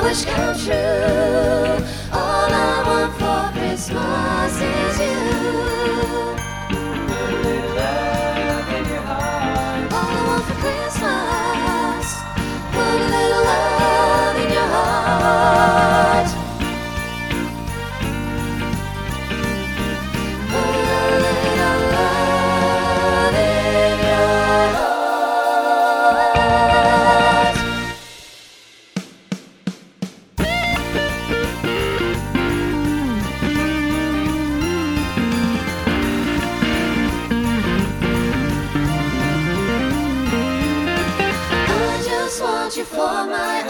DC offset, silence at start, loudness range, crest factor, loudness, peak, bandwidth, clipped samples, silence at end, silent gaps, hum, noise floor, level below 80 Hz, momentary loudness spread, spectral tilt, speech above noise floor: under 0.1%; 0 s; 6 LU; 18 dB; -18 LUFS; 0 dBFS; 19.5 kHz; under 0.1%; 0 s; none; none; -45 dBFS; -32 dBFS; 9 LU; -5 dB/octave; 27 dB